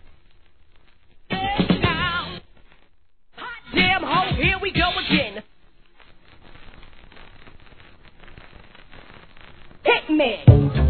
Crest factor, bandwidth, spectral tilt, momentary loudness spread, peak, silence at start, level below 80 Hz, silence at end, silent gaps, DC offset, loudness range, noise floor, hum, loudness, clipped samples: 24 dB; 4.6 kHz; -9.5 dB/octave; 19 LU; 0 dBFS; 1.3 s; -36 dBFS; 0 s; none; 0.3%; 6 LU; -59 dBFS; none; -20 LUFS; under 0.1%